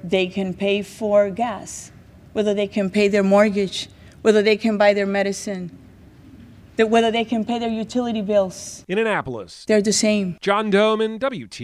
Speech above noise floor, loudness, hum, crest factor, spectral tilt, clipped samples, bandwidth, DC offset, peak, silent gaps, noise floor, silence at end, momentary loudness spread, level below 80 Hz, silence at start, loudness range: 26 dB; -20 LUFS; none; 18 dB; -4.5 dB/octave; under 0.1%; 13 kHz; under 0.1%; -2 dBFS; none; -45 dBFS; 0 s; 13 LU; -54 dBFS; 0.05 s; 4 LU